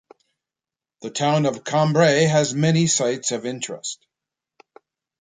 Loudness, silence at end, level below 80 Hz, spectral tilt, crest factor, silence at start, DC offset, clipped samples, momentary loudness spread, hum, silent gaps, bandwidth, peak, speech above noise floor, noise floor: -20 LUFS; 1.3 s; -64 dBFS; -4.5 dB/octave; 18 dB; 1 s; under 0.1%; under 0.1%; 15 LU; none; none; 9.6 kHz; -4 dBFS; 70 dB; -90 dBFS